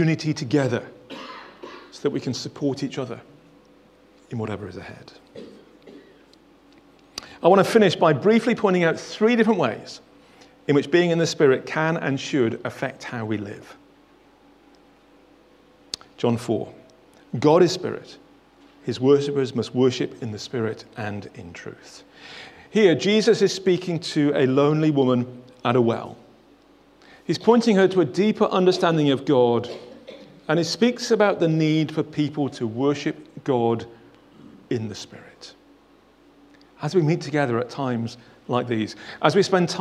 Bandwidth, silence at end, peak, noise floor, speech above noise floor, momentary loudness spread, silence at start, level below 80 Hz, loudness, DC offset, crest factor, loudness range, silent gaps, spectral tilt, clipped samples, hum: 13 kHz; 0 s; 0 dBFS; -55 dBFS; 34 dB; 21 LU; 0 s; -66 dBFS; -22 LUFS; under 0.1%; 22 dB; 12 LU; none; -6 dB/octave; under 0.1%; none